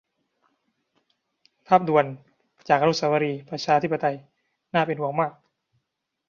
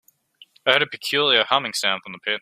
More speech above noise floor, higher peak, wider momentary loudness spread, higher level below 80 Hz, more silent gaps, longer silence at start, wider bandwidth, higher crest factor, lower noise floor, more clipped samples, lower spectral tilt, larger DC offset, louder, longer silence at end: first, 58 dB vs 32 dB; about the same, -4 dBFS vs -2 dBFS; about the same, 10 LU vs 8 LU; about the same, -70 dBFS vs -70 dBFS; neither; first, 1.7 s vs 0.65 s; second, 7.4 kHz vs 16 kHz; about the same, 22 dB vs 22 dB; first, -80 dBFS vs -54 dBFS; neither; first, -6 dB/octave vs -1.5 dB/octave; neither; second, -23 LUFS vs -20 LUFS; first, 0.95 s vs 0 s